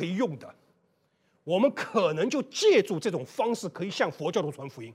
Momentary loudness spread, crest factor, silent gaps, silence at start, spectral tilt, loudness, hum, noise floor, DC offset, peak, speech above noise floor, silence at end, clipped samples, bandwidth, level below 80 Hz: 12 LU; 18 dB; none; 0 s; -5 dB/octave; -27 LUFS; none; -71 dBFS; under 0.1%; -10 dBFS; 43 dB; 0 s; under 0.1%; 15 kHz; -80 dBFS